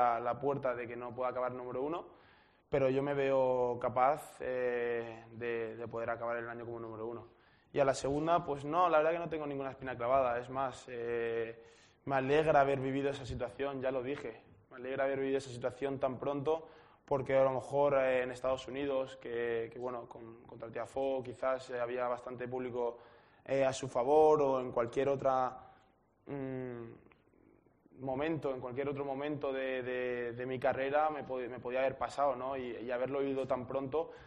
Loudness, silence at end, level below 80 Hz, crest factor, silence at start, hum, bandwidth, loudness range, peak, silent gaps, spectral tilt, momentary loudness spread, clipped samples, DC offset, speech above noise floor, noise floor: -35 LUFS; 0 s; -64 dBFS; 20 dB; 0 s; none; 10 kHz; 6 LU; -14 dBFS; none; -6 dB/octave; 12 LU; under 0.1%; under 0.1%; 35 dB; -69 dBFS